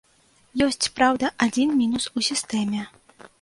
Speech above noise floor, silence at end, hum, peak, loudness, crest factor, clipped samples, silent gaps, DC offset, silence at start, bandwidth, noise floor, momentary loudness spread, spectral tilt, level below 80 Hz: 37 dB; 0.15 s; none; -4 dBFS; -23 LUFS; 20 dB; under 0.1%; none; under 0.1%; 0.55 s; 11.5 kHz; -60 dBFS; 9 LU; -3 dB/octave; -56 dBFS